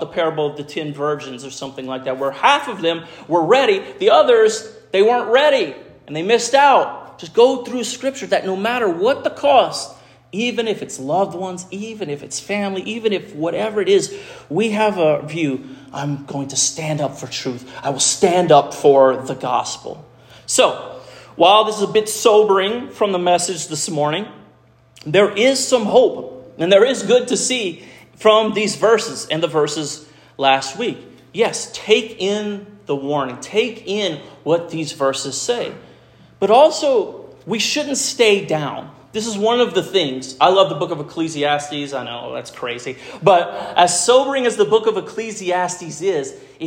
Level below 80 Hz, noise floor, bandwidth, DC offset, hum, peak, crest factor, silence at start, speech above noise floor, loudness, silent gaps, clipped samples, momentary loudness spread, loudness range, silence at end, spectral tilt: -62 dBFS; -51 dBFS; 16 kHz; under 0.1%; none; 0 dBFS; 18 dB; 0 s; 34 dB; -17 LUFS; none; under 0.1%; 14 LU; 5 LU; 0 s; -3 dB/octave